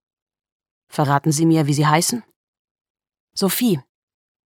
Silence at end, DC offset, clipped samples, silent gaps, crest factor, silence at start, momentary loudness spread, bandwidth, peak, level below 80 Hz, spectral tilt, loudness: 0.7 s; under 0.1%; under 0.1%; 2.36-2.53 s, 2.59-2.75 s, 2.81-2.95 s, 3.20-3.28 s; 20 dB; 0.95 s; 12 LU; 17 kHz; 0 dBFS; -68 dBFS; -5 dB/octave; -18 LUFS